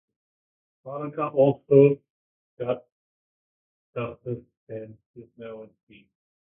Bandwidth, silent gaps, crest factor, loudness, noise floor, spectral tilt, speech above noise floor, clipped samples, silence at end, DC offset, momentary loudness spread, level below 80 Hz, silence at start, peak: 3.6 kHz; 2.10-2.57 s, 2.92-3.93 s, 4.57-4.67 s, 5.06-5.14 s; 24 dB; -24 LUFS; under -90 dBFS; -12.5 dB/octave; over 65 dB; under 0.1%; 0.9 s; under 0.1%; 23 LU; -68 dBFS; 0.85 s; -4 dBFS